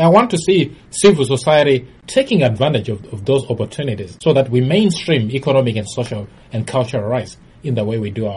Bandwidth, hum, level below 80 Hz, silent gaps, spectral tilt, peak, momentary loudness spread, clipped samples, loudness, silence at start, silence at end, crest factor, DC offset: 11.5 kHz; none; -48 dBFS; none; -6 dB/octave; 0 dBFS; 11 LU; under 0.1%; -16 LUFS; 0 s; 0 s; 16 dB; under 0.1%